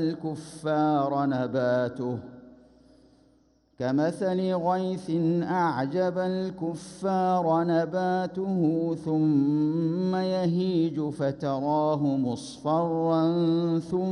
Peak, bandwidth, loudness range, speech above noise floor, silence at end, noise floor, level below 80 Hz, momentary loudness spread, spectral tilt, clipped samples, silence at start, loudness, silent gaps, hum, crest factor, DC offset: -14 dBFS; 11.5 kHz; 4 LU; 38 dB; 0 s; -63 dBFS; -66 dBFS; 8 LU; -8 dB/octave; under 0.1%; 0 s; -27 LUFS; none; none; 12 dB; under 0.1%